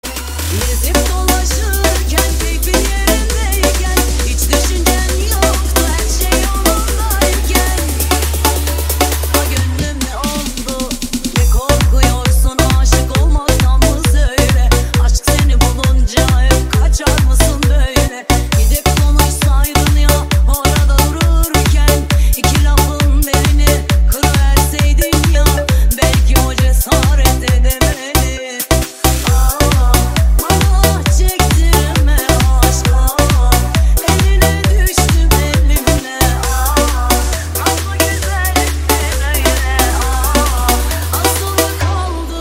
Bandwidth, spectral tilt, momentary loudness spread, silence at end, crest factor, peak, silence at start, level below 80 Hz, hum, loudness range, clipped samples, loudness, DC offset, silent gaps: 16.5 kHz; -4 dB/octave; 4 LU; 0 s; 12 dB; 0 dBFS; 0.05 s; -14 dBFS; none; 2 LU; under 0.1%; -13 LUFS; under 0.1%; none